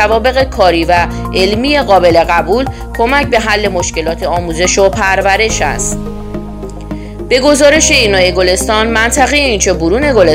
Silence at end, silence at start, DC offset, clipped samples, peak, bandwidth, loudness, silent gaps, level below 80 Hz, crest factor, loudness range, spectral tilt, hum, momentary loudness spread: 0 s; 0 s; 0.1%; 0.5%; 0 dBFS; 16.5 kHz; -10 LUFS; none; -24 dBFS; 10 dB; 4 LU; -3.5 dB/octave; none; 14 LU